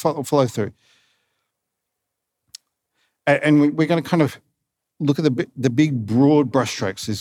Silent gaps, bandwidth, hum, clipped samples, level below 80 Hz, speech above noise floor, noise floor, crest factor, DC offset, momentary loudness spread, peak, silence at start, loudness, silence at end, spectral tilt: none; 16 kHz; none; under 0.1%; -68 dBFS; 62 dB; -80 dBFS; 18 dB; under 0.1%; 10 LU; -2 dBFS; 0 s; -19 LUFS; 0 s; -6.5 dB/octave